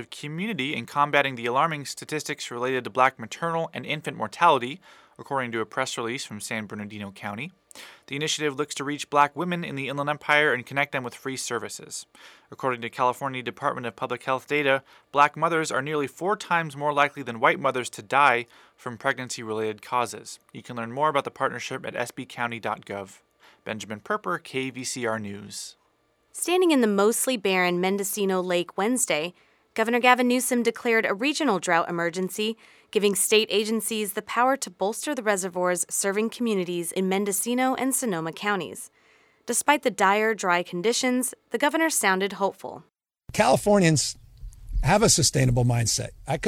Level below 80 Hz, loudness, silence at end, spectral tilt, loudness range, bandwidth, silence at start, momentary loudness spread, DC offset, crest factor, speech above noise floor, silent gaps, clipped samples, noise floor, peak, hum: -48 dBFS; -25 LUFS; 0 s; -3.5 dB/octave; 7 LU; 19 kHz; 0 s; 14 LU; under 0.1%; 22 dB; 42 dB; none; under 0.1%; -67 dBFS; -4 dBFS; none